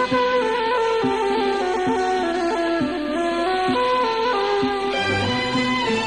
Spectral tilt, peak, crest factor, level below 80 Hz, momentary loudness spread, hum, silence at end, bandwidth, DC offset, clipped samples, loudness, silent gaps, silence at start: -4.5 dB/octave; -10 dBFS; 12 dB; -48 dBFS; 2 LU; none; 0 s; 10.5 kHz; 0.2%; under 0.1%; -21 LUFS; none; 0 s